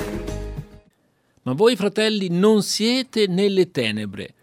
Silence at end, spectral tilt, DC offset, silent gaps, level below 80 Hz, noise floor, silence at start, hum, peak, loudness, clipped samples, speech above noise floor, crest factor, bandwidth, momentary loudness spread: 0.15 s; -5 dB/octave; under 0.1%; none; -42 dBFS; -63 dBFS; 0 s; none; -4 dBFS; -20 LUFS; under 0.1%; 43 dB; 16 dB; 16 kHz; 15 LU